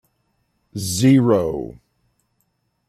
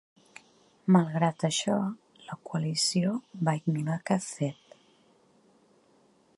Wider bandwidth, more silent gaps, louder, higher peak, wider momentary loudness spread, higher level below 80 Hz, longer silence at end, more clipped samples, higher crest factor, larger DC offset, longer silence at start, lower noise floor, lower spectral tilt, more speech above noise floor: first, 14.5 kHz vs 11.5 kHz; neither; first, -18 LUFS vs -29 LUFS; first, -4 dBFS vs -8 dBFS; first, 20 LU vs 12 LU; first, -52 dBFS vs -74 dBFS; second, 1.15 s vs 1.85 s; neither; second, 16 dB vs 22 dB; neither; about the same, 0.75 s vs 0.85 s; first, -69 dBFS vs -64 dBFS; about the same, -6 dB/octave vs -5 dB/octave; first, 52 dB vs 36 dB